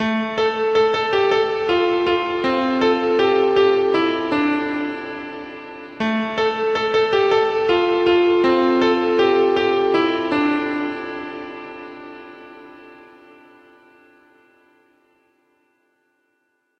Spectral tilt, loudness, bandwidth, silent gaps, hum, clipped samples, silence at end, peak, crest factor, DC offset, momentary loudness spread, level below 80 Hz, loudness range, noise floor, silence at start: -5.5 dB/octave; -18 LUFS; 7.4 kHz; none; none; under 0.1%; 3.85 s; -4 dBFS; 14 dB; under 0.1%; 17 LU; -56 dBFS; 10 LU; -69 dBFS; 0 s